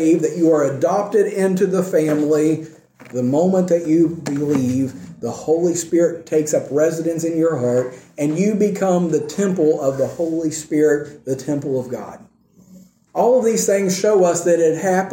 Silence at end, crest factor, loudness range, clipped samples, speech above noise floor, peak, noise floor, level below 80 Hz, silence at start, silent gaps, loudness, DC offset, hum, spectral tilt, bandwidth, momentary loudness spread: 0 s; 14 dB; 3 LU; under 0.1%; 31 dB; -4 dBFS; -48 dBFS; -62 dBFS; 0 s; none; -18 LUFS; under 0.1%; none; -6 dB/octave; 16.5 kHz; 8 LU